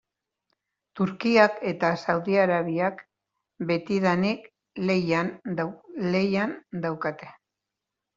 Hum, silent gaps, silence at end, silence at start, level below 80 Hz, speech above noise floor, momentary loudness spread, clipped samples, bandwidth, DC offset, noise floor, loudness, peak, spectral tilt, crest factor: none; none; 0.85 s; 0.95 s; -66 dBFS; 61 dB; 10 LU; under 0.1%; 7.6 kHz; under 0.1%; -86 dBFS; -26 LUFS; -4 dBFS; -7 dB/octave; 22 dB